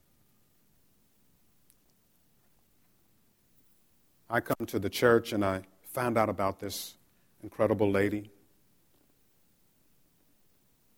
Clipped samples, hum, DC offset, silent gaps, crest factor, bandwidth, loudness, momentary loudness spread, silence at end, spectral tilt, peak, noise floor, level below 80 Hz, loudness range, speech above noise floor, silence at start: under 0.1%; none; under 0.1%; none; 24 dB; over 20 kHz; -30 LUFS; 15 LU; 2.7 s; -5.5 dB/octave; -10 dBFS; -69 dBFS; -66 dBFS; 8 LU; 40 dB; 4.3 s